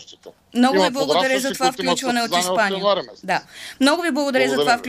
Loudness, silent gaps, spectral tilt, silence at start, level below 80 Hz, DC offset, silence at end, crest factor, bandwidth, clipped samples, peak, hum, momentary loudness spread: -19 LUFS; none; -3 dB/octave; 0 s; -62 dBFS; under 0.1%; 0 s; 16 dB; 15.5 kHz; under 0.1%; -4 dBFS; none; 7 LU